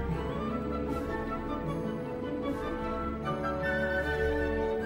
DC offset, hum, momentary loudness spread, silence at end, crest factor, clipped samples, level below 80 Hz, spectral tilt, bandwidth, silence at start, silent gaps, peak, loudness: under 0.1%; none; 5 LU; 0 s; 14 dB; under 0.1%; -42 dBFS; -7.5 dB/octave; 16 kHz; 0 s; none; -18 dBFS; -33 LUFS